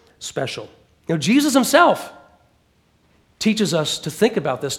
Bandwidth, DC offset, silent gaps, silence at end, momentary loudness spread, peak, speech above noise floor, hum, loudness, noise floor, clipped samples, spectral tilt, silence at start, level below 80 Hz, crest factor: 18 kHz; under 0.1%; none; 0 s; 15 LU; 0 dBFS; 42 dB; none; -19 LUFS; -60 dBFS; under 0.1%; -4 dB/octave; 0.2 s; -60 dBFS; 20 dB